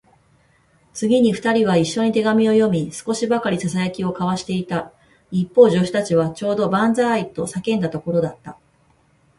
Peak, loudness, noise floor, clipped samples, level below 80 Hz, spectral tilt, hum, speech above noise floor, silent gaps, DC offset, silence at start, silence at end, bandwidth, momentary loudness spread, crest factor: -2 dBFS; -19 LUFS; -58 dBFS; under 0.1%; -56 dBFS; -6 dB/octave; none; 40 dB; none; under 0.1%; 0.95 s; 0.85 s; 11.5 kHz; 10 LU; 18 dB